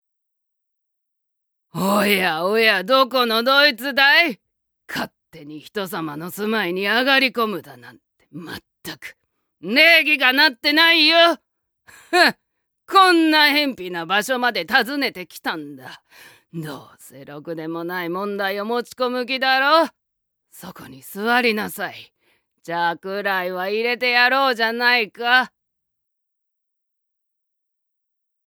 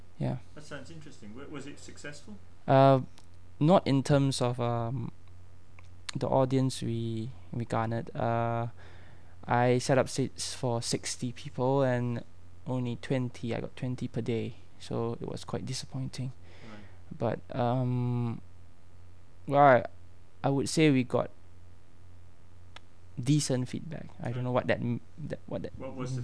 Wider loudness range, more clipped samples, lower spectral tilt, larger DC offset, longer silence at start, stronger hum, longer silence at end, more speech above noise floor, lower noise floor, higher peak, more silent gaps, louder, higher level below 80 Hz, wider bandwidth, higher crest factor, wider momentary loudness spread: about the same, 10 LU vs 8 LU; neither; second, -3.5 dB/octave vs -6 dB/octave; second, under 0.1% vs 0.7%; first, 1.75 s vs 0.2 s; neither; first, 3 s vs 0 s; first, 56 dB vs 26 dB; first, -75 dBFS vs -56 dBFS; first, 0 dBFS vs -8 dBFS; neither; first, -17 LUFS vs -30 LUFS; second, -70 dBFS vs -60 dBFS; first, over 20 kHz vs 11 kHz; about the same, 20 dB vs 22 dB; about the same, 21 LU vs 20 LU